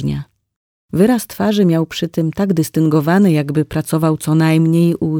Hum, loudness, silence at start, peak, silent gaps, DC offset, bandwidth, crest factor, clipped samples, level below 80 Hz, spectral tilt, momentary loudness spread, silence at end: none; -15 LUFS; 0 s; -2 dBFS; 0.56-0.89 s; under 0.1%; 18.5 kHz; 14 dB; under 0.1%; -46 dBFS; -7 dB/octave; 6 LU; 0 s